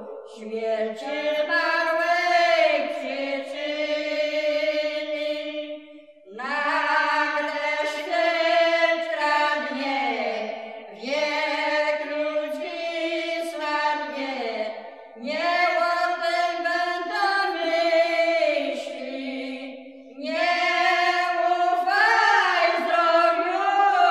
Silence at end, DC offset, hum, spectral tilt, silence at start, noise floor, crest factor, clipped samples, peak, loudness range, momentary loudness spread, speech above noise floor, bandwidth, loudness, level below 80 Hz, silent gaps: 0 s; under 0.1%; none; -2 dB/octave; 0 s; -47 dBFS; 18 dB; under 0.1%; -6 dBFS; 6 LU; 13 LU; 21 dB; 12.5 kHz; -23 LUFS; -84 dBFS; none